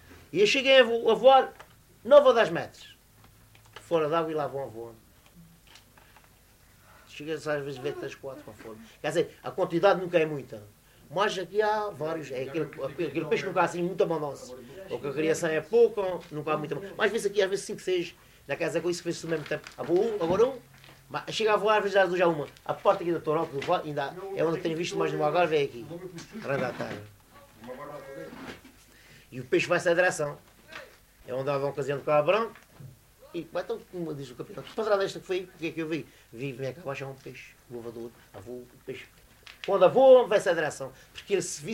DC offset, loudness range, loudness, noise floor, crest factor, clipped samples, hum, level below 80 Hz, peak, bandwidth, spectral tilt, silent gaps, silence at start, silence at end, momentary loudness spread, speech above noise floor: under 0.1%; 13 LU; -27 LUFS; -58 dBFS; 22 dB; under 0.1%; none; -64 dBFS; -6 dBFS; 16 kHz; -4.5 dB/octave; none; 0.1 s; 0 s; 20 LU; 31 dB